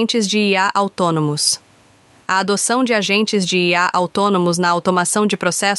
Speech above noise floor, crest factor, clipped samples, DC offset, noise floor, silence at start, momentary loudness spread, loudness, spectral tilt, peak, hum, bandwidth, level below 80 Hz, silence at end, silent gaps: 34 dB; 16 dB; under 0.1%; under 0.1%; -50 dBFS; 0 s; 3 LU; -16 LUFS; -3.5 dB/octave; -2 dBFS; none; 12 kHz; -64 dBFS; 0 s; none